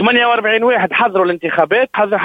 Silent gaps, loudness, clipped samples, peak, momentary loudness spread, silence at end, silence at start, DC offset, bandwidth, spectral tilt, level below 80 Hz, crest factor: none; -13 LUFS; under 0.1%; 0 dBFS; 4 LU; 0 s; 0 s; under 0.1%; 5 kHz; -6.5 dB/octave; -60 dBFS; 14 dB